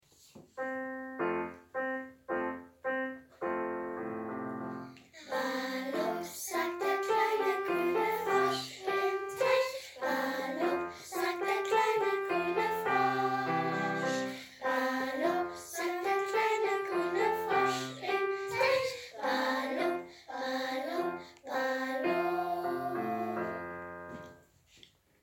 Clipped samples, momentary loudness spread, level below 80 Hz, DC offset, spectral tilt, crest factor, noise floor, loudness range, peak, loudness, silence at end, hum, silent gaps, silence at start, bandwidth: under 0.1%; 10 LU; -74 dBFS; under 0.1%; -4 dB/octave; 18 dB; -62 dBFS; 6 LU; -16 dBFS; -33 LUFS; 0.85 s; none; none; 0.35 s; 17 kHz